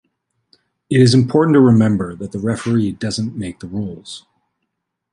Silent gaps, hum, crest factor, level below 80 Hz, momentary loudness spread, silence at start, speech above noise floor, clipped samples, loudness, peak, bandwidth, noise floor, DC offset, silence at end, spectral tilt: none; none; 16 dB; -48 dBFS; 16 LU; 0.9 s; 60 dB; under 0.1%; -16 LUFS; -2 dBFS; 11 kHz; -75 dBFS; under 0.1%; 0.95 s; -7 dB/octave